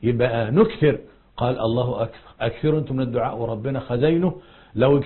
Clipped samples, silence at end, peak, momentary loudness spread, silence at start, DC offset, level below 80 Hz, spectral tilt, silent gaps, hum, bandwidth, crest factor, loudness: under 0.1%; 0 s; -6 dBFS; 10 LU; 0 s; under 0.1%; -46 dBFS; -12.5 dB/octave; none; none; 4.3 kHz; 16 dB; -22 LUFS